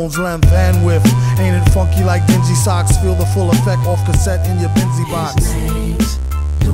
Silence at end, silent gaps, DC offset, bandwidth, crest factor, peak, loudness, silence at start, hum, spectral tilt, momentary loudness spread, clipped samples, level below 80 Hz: 0 s; none; under 0.1%; 16.5 kHz; 12 dB; 0 dBFS; -14 LUFS; 0 s; none; -6 dB/octave; 6 LU; under 0.1%; -20 dBFS